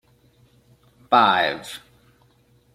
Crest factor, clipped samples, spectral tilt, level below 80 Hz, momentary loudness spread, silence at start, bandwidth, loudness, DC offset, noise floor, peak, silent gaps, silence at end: 22 dB; under 0.1%; -3.5 dB/octave; -64 dBFS; 21 LU; 1.1 s; 15.5 kHz; -19 LUFS; under 0.1%; -59 dBFS; -2 dBFS; none; 0.95 s